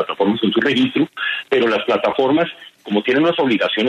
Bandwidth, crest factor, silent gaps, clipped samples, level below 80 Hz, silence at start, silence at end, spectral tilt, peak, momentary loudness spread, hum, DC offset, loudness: 10 kHz; 14 dB; none; under 0.1%; -62 dBFS; 0 s; 0 s; -6 dB/octave; -4 dBFS; 6 LU; none; under 0.1%; -17 LUFS